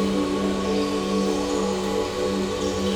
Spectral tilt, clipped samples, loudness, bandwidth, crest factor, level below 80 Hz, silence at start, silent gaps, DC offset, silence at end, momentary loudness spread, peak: -5 dB/octave; under 0.1%; -24 LUFS; 16.5 kHz; 12 dB; -44 dBFS; 0 s; none; under 0.1%; 0 s; 2 LU; -12 dBFS